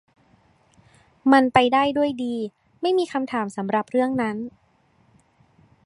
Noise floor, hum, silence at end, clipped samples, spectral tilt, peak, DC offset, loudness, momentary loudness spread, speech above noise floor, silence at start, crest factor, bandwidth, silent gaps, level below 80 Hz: -61 dBFS; none; 1.35 s; under 0.1%; -5.5 dB/octave; -2 dBFS; under 0.1%; -22 LUFS; 12 LU; 40 dB; 1.25 s; 22 dB; 11 kHz; none; -60 dBFS